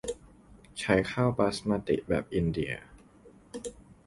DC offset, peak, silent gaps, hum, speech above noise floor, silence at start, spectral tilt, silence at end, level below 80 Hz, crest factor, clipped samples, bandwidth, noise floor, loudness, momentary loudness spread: under 0.1%; -10 dBFS; none; none; 28 dB; 0.05 s; -6 dB/octave; 0.15 s; -50 dBFS; 22 dB; under 0.1%; 11.5 kHz; -56 dBFS; -30 LUFS; 17 LU